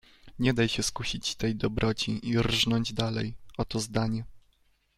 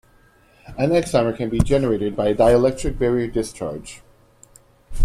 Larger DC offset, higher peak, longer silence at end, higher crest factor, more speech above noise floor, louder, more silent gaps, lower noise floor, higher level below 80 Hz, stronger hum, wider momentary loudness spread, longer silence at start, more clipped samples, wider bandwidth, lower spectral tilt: neither; second, -10 dBFS vs -2 dBFS; first, 0.6 s vs 0 s; about the same, 20 dB vs 18 dB; first, 39 dB vs 35 dB; second, -29 LUFS vs -20 LUFS; neither; first, -67 dBFS vs -54 dBFS; second, -46 dBFS vs -34 dBFS; neither; second, 9 LU vs 14 LU; second, 0.25 s vs 0.65 s; neither; about the same, 15.5 kHz vs 15 kHz; second, -4.5 dB/octave vs -6.5 dB/octave